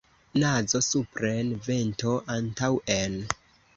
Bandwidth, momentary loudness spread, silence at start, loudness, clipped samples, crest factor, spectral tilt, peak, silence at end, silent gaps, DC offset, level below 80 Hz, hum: 8 kHz; 7 LU; 0.35 s; -27 LUFS; under 0.1%; 24 dB; -4.5 dB/octave; -4 dBFS; 0.45 s; none; under 0.1%; -54 dBFS; none